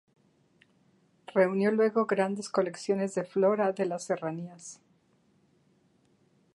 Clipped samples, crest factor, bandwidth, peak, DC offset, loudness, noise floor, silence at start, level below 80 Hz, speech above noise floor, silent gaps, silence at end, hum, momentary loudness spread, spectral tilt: under 0.1%; 18 dB; 11.5 kHz; -12 dBFS; under 0.1%; -29 LUFS; -68 dBFS; 1.3 s; -82 dBFS; 40 dB; none; 1.8 s; none; 13 LU; -6 dB/octave